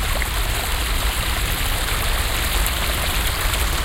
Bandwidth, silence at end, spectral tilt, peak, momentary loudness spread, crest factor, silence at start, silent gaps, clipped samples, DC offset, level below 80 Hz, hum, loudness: 17 kHz; 0 s; -2.5 dB/octave; -4 dBFS; 2 LU; 18 dB; 0 s; none; under 0.1%; under 0.1%; -24 dBFS; none; -21 LUFS